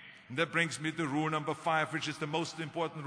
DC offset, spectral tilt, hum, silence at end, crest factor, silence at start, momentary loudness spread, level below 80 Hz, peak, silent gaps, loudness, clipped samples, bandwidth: under 0.1%; -4.5 dB/octave; none; 0 s; 18 dB; 0 s; 6 LU; -76 dBFS; -16 dBFS; none; -34 LUFS; under 0.1%; 10.5 kHz